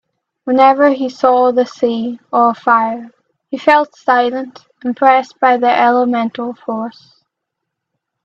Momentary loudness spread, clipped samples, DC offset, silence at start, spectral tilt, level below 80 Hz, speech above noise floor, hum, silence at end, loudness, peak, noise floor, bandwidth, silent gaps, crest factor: 13 LU; under 0.1%; under 0.1%; 0.45 s; -5.5 dB/octave; -64 dBFS; 64 dB; none; 1.35 s; -13 LUFS; 0 dBFS; -77 dBFS; 7.2 kHz; none; 14 dB